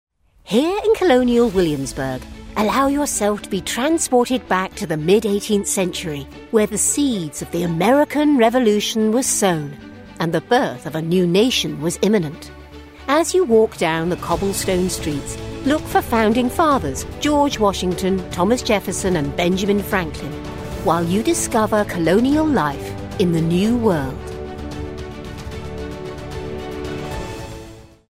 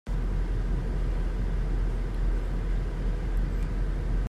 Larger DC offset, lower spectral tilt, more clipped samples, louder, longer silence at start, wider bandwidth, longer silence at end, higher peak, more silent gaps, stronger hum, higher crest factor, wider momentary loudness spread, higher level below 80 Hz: first, 0.1% vs under 0.1%; second, -4.5 dB/octave vs -8 dB/octave; neither; first, -19 LUFS vs -32 LUFS; first, 0.45 s vs 0.05 s; first, 16 kHz vs 6 kHz; first, 0.3 s vs 0 s; first, -4 dBFS vs -18 dBFS; neither; neither; first, 16 dB vs 10 dB; first, 14 LU vs 1 LU; second, -38 dBFS vs -28 dBFS